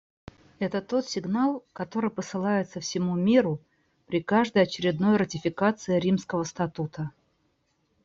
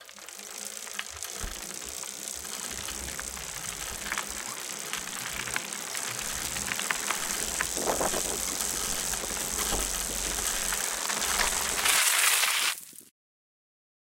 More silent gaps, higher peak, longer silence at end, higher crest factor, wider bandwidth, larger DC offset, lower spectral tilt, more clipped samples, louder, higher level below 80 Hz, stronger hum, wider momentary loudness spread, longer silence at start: neither; about the same, -8 dBFS vs -8 dBFS; about the same, 0.95 s vs 1 s; second, 18 dB vs 24 dB; second, 7.6 kHz vs 17 kHz; neither; first, -6 dB/octave vs 0 dB/octave; neither; about the same, -27 LUFS vs -28 LUFS; second, -64 dBFS vs -48 dBFS; neither; about the same, 11 LU vs 13 LU; first, 0.6 s vs 0 s